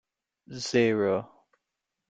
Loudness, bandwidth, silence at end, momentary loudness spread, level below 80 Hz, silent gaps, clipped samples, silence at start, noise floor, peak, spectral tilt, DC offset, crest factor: -27 LUFS; 9.2 kHz; 0.85 s; 13 LU; -68 dBFS; none; under 0.1%; 0.5 s; -85 dBFS; -10 dBFS; -5 dB/octave; under 0.1%; 20 dB